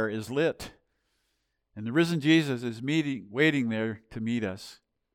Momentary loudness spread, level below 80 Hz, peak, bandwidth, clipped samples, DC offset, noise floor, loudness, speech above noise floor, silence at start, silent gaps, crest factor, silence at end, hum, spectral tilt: 16 LU; -64 dBFS; -10 dBFS; 15 kHz; under 0.1%; under 0.1%; -77 dBFS; -28 LUFS; 50 dB; 0 s; none; 18 dB; 0.4 s; none; -6 dB/octave